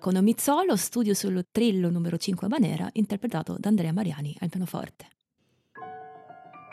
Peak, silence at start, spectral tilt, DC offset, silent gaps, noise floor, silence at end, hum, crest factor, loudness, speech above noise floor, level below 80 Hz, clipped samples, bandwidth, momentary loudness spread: -12 dBFS; 0 s; -5.5 dB/octave; under 0.1%; none; -72 dBFS; 0 s; none; 14 dB; -27 LUFS; 46 dB; -68 dBFS; under 0.1%; 14.5 kHz; 19 LU